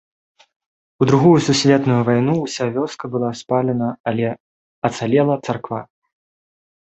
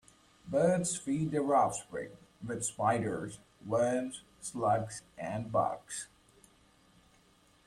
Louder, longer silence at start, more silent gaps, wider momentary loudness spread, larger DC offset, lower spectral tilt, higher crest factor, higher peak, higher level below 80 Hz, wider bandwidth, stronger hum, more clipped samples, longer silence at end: first, -18 LUFS vs -33 LUFS; first, 1 s vs 0.45 s; first, 4.00-4.04 s, 4.40-4.82 s vs none; second, 11 LU vs 14 LU; neither; about the same, -6 dB/octave vs -5 dB/octave; about the same, 18 dB vs 18 dB; first, -2 dBFS vs -16 dBFS; first, -56 dBFS vs -66 dBFS; second, 8.4 kHz vs 14 kHz; neither; neither; second, 1 s vs 1.6 s